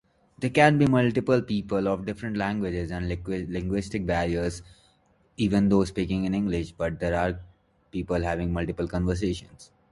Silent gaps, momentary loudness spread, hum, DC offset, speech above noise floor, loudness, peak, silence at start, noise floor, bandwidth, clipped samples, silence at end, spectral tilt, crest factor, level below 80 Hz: none; 10 LU; none; under 0.1%; 38 dB; -26 LUFS; -4 dBFS; 0.4 s; -64 dBFS; 11.5 kHz; under 0.1%; 0.25 s; -7 dB/octave; 22 dB; -42 dBFS